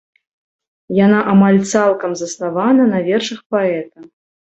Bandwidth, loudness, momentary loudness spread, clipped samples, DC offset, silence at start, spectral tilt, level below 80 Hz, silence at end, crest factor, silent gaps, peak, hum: 8.2 kHz; -15 LUFS; 11 LU; under 0.1%; under 0.1%; 0.9 s; -6 dB/octave; -58 dBFS; 0.45 s; 14 dB; 3.46-3.50 s; -2 dBFS; none